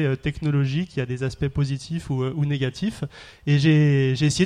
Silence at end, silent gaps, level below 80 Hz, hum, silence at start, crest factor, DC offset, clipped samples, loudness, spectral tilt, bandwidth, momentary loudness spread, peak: 0 s; none; -46 dBFS; none; 0 s; 16 dB; under 0.1%; under 0.1%; -23 LUFS; -6.5 dB/octave; 10.5 kHz; 11 LU; -6 dBFS